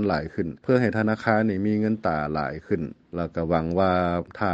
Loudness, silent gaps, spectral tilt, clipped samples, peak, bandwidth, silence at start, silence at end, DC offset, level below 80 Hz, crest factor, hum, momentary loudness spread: -25 LUFS; none; -8.5 dB/octave; under 0.1%; -4 dBFS; 7.8 kHz; 0 s; 0 s; under 0.1%; -48 dBFS; 20 dB; none; 8 LU